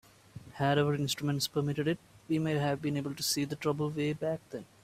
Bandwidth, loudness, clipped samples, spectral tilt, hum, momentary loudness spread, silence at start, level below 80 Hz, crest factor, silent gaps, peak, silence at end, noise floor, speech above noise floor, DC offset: 16 kHz; -32 LUFS; under 0.1%; -5 dB/octave; none; 9 LU; 0.35 s; -66 dBFS; 16 dB; none; -16 dBFS; 0.2 s; -51 dBFS; 20 dB; under 0.1%